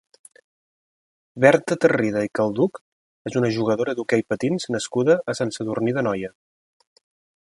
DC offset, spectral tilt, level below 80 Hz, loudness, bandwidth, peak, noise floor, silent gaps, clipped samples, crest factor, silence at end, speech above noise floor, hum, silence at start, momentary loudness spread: under 0.1%; -6 dB/octave; -62 dBFS; -22 LUFS; 11.5 kHz; 0 dBFS; under -90 dBFS; 2.81-3.25 s; under 0.1%; 22 dB; 1.1 s; over 69 dB; none; 1.35 s; 8 LU